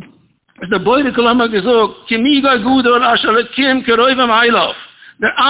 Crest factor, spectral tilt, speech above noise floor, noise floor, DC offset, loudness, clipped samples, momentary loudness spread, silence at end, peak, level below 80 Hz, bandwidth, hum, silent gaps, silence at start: 12 dB; -8 dB/octave; 38 dB; -51 dBFS; under 0.1%; -12 LUFS; under 0.1%; 7 LU; 0 s; 0 dBFS; -48 dBFS; 4 kHz; none; none; 0 s